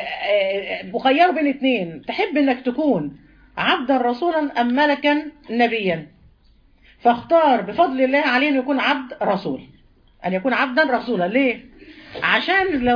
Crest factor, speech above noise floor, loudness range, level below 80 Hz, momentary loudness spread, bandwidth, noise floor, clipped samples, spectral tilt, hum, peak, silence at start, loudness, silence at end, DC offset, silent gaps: 16 dB; 35 dB; 2 LU; -54 dBFS; 9 LU; 5.2 kHz; -54 dBFS; under 0.1%; -6.5 dB/octave; none; -4 dBFS; 0 s; -19 LUFS; 0 s; under 0.1%; none